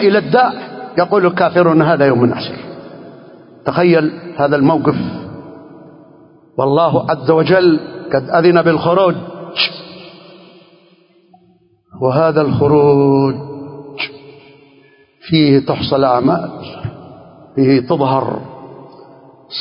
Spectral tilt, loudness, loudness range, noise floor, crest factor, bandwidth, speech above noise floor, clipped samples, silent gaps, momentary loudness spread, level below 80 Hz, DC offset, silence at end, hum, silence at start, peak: -10.5 dB/octave; -13 LUFS; 4 LU; -53 dBFS; 14 dB; 5.4 kHz; 40 dB; under 0.1%; none; 18 LU; -50 dBFS; under 0.1%; 0 s; none; 0 s; 0 dBFS